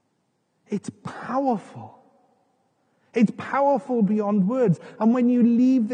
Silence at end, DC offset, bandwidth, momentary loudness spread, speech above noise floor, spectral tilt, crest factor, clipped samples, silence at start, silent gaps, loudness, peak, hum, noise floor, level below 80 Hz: 0 s; under 0.1%; 9.2 kHz; 14 LU; 50 dB; -8.5 dB/octave; 14 dB; under 0.1%; 0.7 s; none; -22 LUFS; -8 dBFS; none; -71 dBFS; -84 dBFS